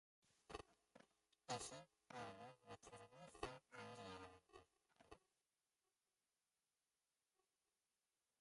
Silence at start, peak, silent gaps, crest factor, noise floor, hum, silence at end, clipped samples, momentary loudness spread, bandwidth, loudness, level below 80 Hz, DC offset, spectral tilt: 0.25 s; -34 dBFS; none; 28 dB; under -90 dBFS; none; 3.25 s; under 0.1%; 17 LU; 11.5 kHz; -57 LUFS; -80 dBFS; under 0.1%; -3 dB/octave